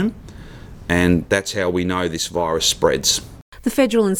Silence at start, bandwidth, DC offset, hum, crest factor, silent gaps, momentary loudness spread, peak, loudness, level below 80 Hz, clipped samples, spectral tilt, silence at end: 0 s; 19 kHz; under 0.1%; none; 18 dB; 3.42-3.52 s; 19 LU; -2 dBFS; -19 LUFS; -42 dBFS; under 0.1%; -3.5 dB/octave; 0 s